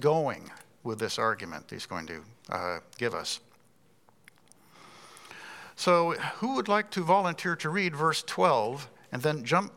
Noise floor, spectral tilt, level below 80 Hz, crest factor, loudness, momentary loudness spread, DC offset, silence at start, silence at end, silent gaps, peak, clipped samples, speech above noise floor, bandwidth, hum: -65 dBFS; -4.5 dB/octave; -76 dBFS; 22 dB; -29 LUFS; 19 LU; under 0.1%; 0 s; 0.05 s; none; -8 dBFS; under 0.1%; 36 dB; 17 kHz; none